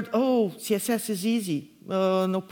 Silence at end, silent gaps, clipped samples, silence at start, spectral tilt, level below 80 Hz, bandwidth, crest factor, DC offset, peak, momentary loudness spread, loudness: 0.05 s; none; under 0.1%; 0 s; -5.5 dB/octave; -74 dBFS; 20 kHz; 14 dB; under 0.1%; -12 dBFS; 7 LU; -26 LUFS